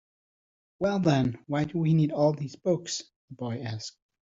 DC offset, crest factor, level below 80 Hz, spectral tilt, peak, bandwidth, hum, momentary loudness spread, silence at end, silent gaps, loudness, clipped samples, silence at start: under 0.1%; 20 dB; -62 dBFS; -6.5 dB/octave; -10 dBFS; 7.8 kHz; none; 12 LU; 0.3 s; 3.16-3.28 s; -28 LUFS; under 0.1%; 0.8 s